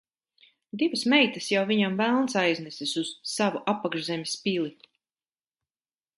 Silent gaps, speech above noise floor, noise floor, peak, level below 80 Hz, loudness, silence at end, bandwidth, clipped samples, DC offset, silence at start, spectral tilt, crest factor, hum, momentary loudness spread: none; over 64 dB; under -90 dBFS; -8 dBFS; -76 dBFS; -26 LUFS; 1.45 s; 11.5 kHz; under 0.1%; under 0.1%; 0.75 s; -4 dB/octave; 20 dB; none; 9 LU